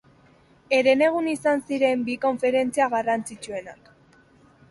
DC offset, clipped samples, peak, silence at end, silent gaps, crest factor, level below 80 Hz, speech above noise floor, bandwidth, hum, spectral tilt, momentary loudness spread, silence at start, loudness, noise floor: under 0.1%; under 0.1%; -6 dBFS; 0.95 s; none; 18 dB; -64 dBFS; 33 dB; 11.5 kHz; none; -4 dB/octave; 13 LU; 0.7 s; -23 LUFS; -56 dBFS